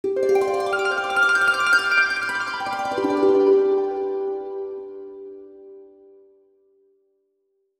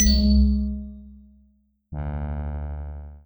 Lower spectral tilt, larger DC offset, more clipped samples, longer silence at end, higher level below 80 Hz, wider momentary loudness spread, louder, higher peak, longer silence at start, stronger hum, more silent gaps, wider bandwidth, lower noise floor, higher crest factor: second, -3 dB/octave vs -5 dB/octave; neither; neither; first, 1.95 s vs 0.05 s; second, -66 dBFS vs -26 dBFS; about the same, 18 LU vs 20 LU; first, -20 LUFS vs -24 LUFS; about the same, -6 dBFS vs -6 dBFS; about the same, 0.05 s vs 0 s; neither; neither; second, 13 kHz vs over 20 kHz; first, -71 dBFS vs -62 dBFS; about the same, 16 dB vs 18 dB